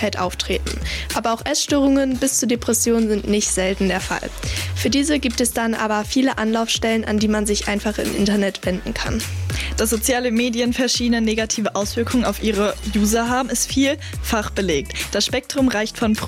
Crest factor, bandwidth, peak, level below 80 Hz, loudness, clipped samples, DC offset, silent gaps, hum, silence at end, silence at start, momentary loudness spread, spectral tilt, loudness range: 12 dB; 16.5 kHz; -8 dBFS; -34 dBFS; -20 LUFS; under 0.1%; under 0.1%; none; none; 0 s; 0 s; 6 LU; -3.5 dB/octave; 2 LU